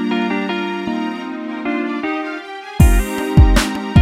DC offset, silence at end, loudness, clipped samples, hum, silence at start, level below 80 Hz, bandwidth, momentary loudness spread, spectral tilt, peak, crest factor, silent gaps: under 0.1%; 0 s; -18 LUFS; under 0.1%; none; 0 s; -20 dBFS; 16 kHz; 13 LU; -6 dB/octave; 0 dBFS; 16 dB; none